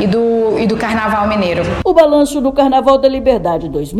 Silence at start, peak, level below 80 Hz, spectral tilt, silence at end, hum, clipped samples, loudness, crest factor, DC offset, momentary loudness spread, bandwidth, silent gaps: 0 s; 0 dBFS; -34 dBFS; -6 dB/octave; 0 s; none; 0.4%; -13 LUFS; 12 dB; under 0.1%; 6 LU; 14.5 kHz; none